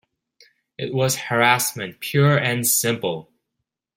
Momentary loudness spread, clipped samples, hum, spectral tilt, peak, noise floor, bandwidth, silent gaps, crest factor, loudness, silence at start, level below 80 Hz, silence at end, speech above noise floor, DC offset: 11 LU; under 0.1%; none; -3.5 dB/octave; -2 dBFS; -80 dBFS; 16.5 kHz; none; 20 dB; -20 LUFS; 0.8 s; -62 dBFS; 0.75 s; 60 dB; under 0.1%